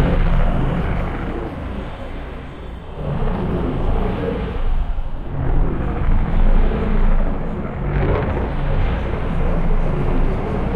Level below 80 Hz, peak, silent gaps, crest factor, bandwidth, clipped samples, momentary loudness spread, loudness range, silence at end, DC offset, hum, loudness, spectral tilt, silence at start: -18 dBFS; -4 dBFS; none; 14 dB; 4.2 kHz; under 0.1%; 9 LU; 4 LU; 0 s; under 0.1%; none; -23 LUFS; -9 dB/octave; 0 s